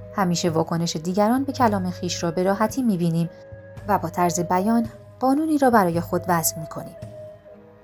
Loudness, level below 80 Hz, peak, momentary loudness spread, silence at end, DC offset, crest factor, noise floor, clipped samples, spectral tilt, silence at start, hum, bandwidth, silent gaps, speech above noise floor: -22 LUFS; -52 dBFS; -4 dBFS; 17 LU; 0.3 s; under 0.1%; 18 dB; -46 dBFS; under 0.1%; -5.5 dB/octave; 0 s; none; 19.5 kHz; none; 25 dB